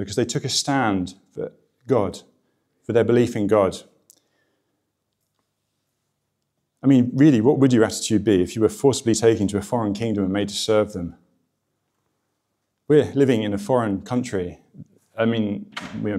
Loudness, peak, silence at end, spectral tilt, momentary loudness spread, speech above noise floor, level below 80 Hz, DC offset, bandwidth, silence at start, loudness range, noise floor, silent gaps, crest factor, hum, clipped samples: -20 LUFS; -4 dBFS; 0 s; -5.5 dB/octave; 16 LU; 56 dB; -58 dBFS; under 0.1%; 14.5 kHz; 0 s; 7 LU; -76 dBFS; none; 18 dB; none; under 0.1%